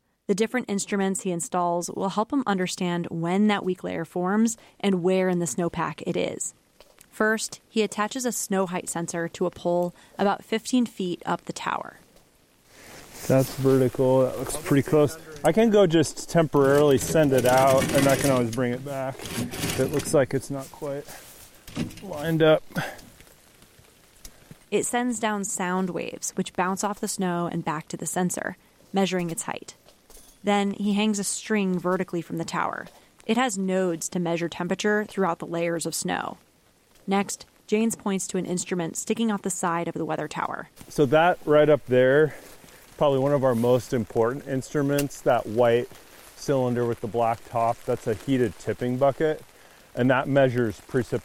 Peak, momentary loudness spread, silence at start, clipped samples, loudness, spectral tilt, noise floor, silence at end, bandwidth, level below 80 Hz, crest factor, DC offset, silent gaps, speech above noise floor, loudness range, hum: -8 dBFS; 11 LU; 0.3 s; under 0.1%; -25 LUFS; -5 dB/octave; -60 dBFS; 0 s; 16.5 kHz; -54 dBFS; 16 dB; under 0.1%; none; 36 dB; 7 LU; none